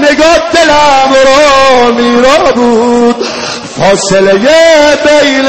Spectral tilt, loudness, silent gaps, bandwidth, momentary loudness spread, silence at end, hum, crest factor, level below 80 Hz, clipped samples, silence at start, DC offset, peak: -3 dB/octave; -5 LUFS; none; 13.5 kHz; 6 LU; 0 s; none; 6 dB; -34 dBFS; 2%; 0 s; under 0.1%; 0 dBFS